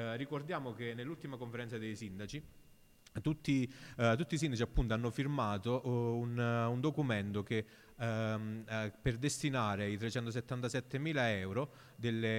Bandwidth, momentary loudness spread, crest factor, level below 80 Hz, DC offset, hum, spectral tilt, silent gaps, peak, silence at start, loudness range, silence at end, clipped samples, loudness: 16 kHz; 10 LU; 18 dB; -52 dBFS; under 0.1%; none; -6 dB/octave; none; -20 dBFS; 0 s; 6 LU; 0 s; under 0.1%; -38 LUFS